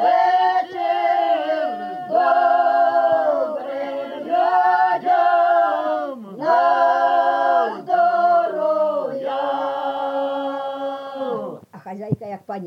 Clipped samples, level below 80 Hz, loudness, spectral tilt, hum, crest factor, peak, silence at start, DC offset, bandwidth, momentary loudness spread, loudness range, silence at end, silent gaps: under 0.1%; -74 dBFS; -19 LUFS; -6.5 dB/octave; none; 12 dB; -6 dBFS; 0 s; under 0.1%; 6.2 kHz; 11 LU; 6 LU; 0 s; none